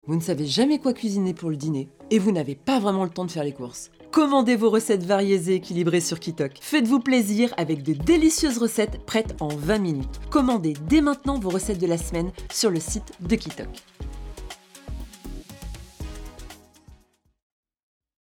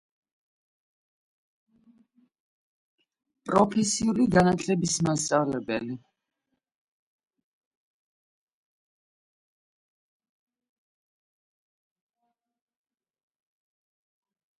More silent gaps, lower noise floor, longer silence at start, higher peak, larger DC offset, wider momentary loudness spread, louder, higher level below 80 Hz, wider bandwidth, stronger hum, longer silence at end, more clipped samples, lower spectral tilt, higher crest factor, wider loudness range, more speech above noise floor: neither; second, -58 dBFS vs -82 dBFS; second, 0.05 s vs 3.45 s; about the same, -8 dBFS vs -8 dBFS; neither; first, 19 LU vs 12 LU; about the same, -23 LUFS vs -25 LUFS; first, -40 dBFS vs -60 dBFS; first, 18 kHz vs 11.5 kHz; neither; second, 1.3 s vs 8.65 s; neither; about the same, -5 dB/octave vs -5 dB/octave; second, 16 dB vs 24 dB; first, 18 LU vs 10 LU; second, 36 dB vs 57 dB